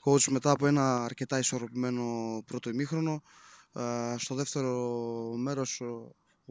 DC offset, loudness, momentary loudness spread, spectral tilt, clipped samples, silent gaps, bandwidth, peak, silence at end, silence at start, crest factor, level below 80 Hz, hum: under 0.1%; -31 LUFS; 12 LU; -5 dB/octave; under 0.1%; none; 8 kHz; -12 dBFS; 0.4 s; 0.05 s; 20 dB; -70 dBFS; none